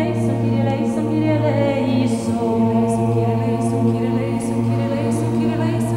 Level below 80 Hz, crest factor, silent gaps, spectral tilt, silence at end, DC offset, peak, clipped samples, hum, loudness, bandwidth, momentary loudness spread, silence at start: -46 dBFS; 12 dB; none; -7.5 dB/octave; 0 s; under 0.1%; -6 dBFS; under 0.1%; none; -19 LUFS; 12.5 kHz; 3 LU; 0 s